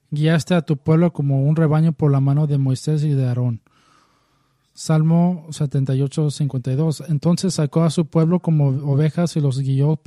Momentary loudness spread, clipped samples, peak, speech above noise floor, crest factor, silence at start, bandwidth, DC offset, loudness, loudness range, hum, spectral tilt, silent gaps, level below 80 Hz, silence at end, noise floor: 5 LU; under 0.1%; -4 dBFS; 45 dB; 14 dB; 0.1 s; 12 kHz; under 0.1%; -19 LUFS; 3 LU; none; -7.5 dB/octave; none; -58 dBFS; 0.1 s; -63 dBFS